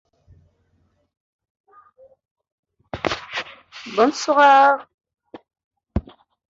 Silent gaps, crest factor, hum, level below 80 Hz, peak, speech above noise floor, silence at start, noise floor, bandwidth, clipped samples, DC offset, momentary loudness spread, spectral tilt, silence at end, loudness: 4.94-4.98 s, 5.64-5.71 s; 20 dB; none; -44 dBFS; -4 dBFS; 50 dB; 2.95 s; -65 dBFS; 7.8 kHz; under 0.1%; under 0.1%; 21 LU; -4 dB/octave; 0.5 s; -18 LUFS